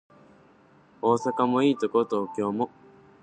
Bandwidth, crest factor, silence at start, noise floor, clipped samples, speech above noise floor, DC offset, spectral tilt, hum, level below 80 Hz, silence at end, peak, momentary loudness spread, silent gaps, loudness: 9.4 kHz; 18 dB; 1.05 s; -57 dBFS; under 0.1%; 33 dB; under 0.1%; -6.5 dB/octave; none; -72 dBFS; 0.55 s; -8 dBFS; 7 LU; none; -26 LUFS